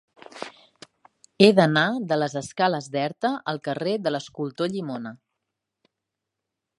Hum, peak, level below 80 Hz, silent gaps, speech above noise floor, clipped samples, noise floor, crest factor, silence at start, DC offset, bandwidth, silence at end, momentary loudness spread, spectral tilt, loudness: none; 0 dBFS; -70 dBFS; none; 61 dB; under 0.1%; -84 dBFS; 26 dB; 0.35 s; under 0.1%; 11.5 kHz; 1.65 s; 20 LU; -5.5 dB/octave; -23 LUFS